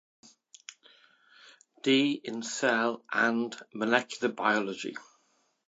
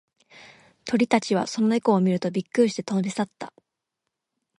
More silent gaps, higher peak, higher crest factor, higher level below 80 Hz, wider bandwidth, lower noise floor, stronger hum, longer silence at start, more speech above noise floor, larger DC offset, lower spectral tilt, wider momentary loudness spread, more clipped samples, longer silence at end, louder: neither; about the same, -6 dBFS vs -6 dBFS; about the same, 24 dB vs 20 dB; second, -84 dBFS vs -70 dBFS; second, 8.6 kHz vs 11.5 kHz; second, -72 dBFS vs -83 dBFS; neither; first, 0.7 s vs 0.35 s; second, 43 dB vs 60 dB; neither; second, -3.5 dB/octave vs -6 dB/octave; first, 21 LU vs 12 LU; neither; second, 0.65 s vs 1.1 s; second, -29 LUFS vs -24 LUFS